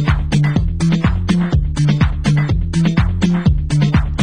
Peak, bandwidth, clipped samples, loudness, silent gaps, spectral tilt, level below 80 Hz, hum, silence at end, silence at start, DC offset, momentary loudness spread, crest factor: 0 dBFS; 10 kHz; under 0.1%; -16 LUFS; none; -7 dB/octave; -20 dBFS; none; 0 s; 0 s; 0.7%; 2 LU; 14 dB